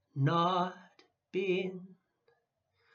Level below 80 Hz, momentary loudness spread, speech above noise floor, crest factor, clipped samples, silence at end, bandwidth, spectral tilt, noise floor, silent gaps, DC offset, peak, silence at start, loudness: -88 dBFS; 12 LU; 47 dB; 18 dB; under 0.1%; 1 s; 6.8 kHz; -7.5 dB/octave; -78 dBFS; none; under 0.1%; -18 dBFS; 0.15 s; -33 LUFS